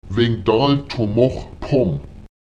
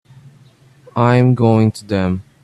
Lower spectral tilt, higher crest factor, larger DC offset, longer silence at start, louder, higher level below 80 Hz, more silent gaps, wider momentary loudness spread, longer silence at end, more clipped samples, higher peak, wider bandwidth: about the same, -8 dB/octave vs -8.5 dB/octave; about the same, 16 dB vs 16 dB; first, 0.4% vs under 0.1%; second, 0.05 s vs 0.95 s; second, -18 LUFS vs -15 LUFS; first, -38 dBFS vs -50 dBFS; neither; about the same, 7 LU vs 8 LU; about the same, 0.15 s vs 0.2 s; neither; about the same, -2 dBFS vs 0 dBFS; second, 8.6 kHz vs 11.5 kHz